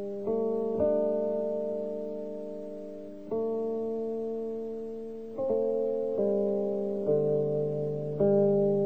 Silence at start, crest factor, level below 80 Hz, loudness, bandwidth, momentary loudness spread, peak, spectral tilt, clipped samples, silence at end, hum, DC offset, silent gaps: 0 s; 14 dB; -68 dBFS; -30 LUFS; 4.2 kHz; 12 LU; -14 dBFS; -11 dB/octave; under 0.1%; 0 s; none; 0.4%; none